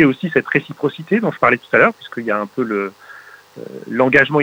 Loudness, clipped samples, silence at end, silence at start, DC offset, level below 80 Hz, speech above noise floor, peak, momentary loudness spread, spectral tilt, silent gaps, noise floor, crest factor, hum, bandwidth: -17 LUFS; under 0.1%; 0 s; 0 s; under 0.1%; -56 dBFS; 24 dB; -2 dBFS; 14 LU; -7 dB/octave; none; -41 dBFS; 16 dB; 50 Hz at -55 dBFS; 16.5 kHz